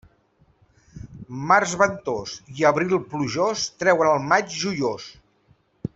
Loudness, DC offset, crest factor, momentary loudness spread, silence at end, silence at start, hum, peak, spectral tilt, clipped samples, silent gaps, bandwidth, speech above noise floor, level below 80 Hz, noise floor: -22 LUFS; under 0.1%; 20 dB; 18 LU; 0.1 s; 0.95 s; none; -2 dBFS; -4 dB/octave; under 0.1%; none; 8.2 kHz; 39 dB; -56 dBFS; -61 dBFS